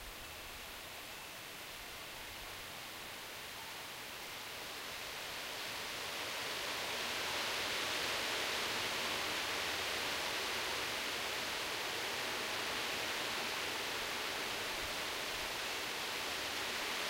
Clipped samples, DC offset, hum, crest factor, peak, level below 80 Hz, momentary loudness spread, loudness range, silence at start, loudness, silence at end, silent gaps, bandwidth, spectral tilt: under 0.1%; under 0.1%; none; 16 dB; -24 dBFS; -66 dBFS; 10 LU; 9 LU; 0 s; -39 LUFS; 0 s; none; 16 kHz; -1 dB/octave